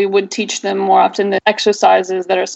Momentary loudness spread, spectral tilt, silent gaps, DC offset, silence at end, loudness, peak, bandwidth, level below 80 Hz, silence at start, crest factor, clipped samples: 6 LU; -3.5 dB/octave; none; under 0.1%; 0 s; -14 LUFS; 0 dBFS; 8.4 kHz; -68 dBFS; 0 s; 14 dB; under 0.1%